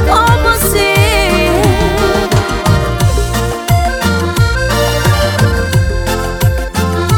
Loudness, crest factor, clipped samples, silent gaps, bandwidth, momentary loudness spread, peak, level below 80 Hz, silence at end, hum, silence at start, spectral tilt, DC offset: -12 LUFS; 10 dB; under 0.1%; none; 19 kHz; 5 LU; 0 dBFS; -20 dBFS; 0 s; none; 0 s; -5 dB/octave; under 0.1%